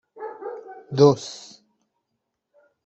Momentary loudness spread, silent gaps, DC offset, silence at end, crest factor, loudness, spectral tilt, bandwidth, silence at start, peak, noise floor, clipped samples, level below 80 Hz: 22 LU; none; under 0.1%; 1.5 s; 22 dB; -19 LUFS; -6.5 dB/octave; 8.2 kHz; 0.2 s; -4 dBFS; -79 dBFS; under 0.1%; -68 dBFS